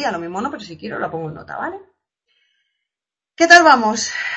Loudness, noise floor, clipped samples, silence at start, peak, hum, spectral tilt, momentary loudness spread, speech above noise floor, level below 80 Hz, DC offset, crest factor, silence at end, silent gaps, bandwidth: -14 LUFS; -88 dBFS; under 0.1%; 0 s; 0 dBFS; none; -2.5 dB/octave; 21 LU; 72 dB; -60 dBFS; under 0.1%; 18 dB; 0 s; none; 8.6 kHz